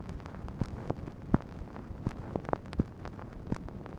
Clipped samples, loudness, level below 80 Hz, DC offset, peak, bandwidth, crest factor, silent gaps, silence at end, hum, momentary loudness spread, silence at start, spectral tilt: under 0.1%; -38 LUFS; -46 dBFS; under 0.1%; -10 dBFS; 11 kHz; 28 dB; none; 0 s; none; 11 LU; 0 s; -8.5 dB/octave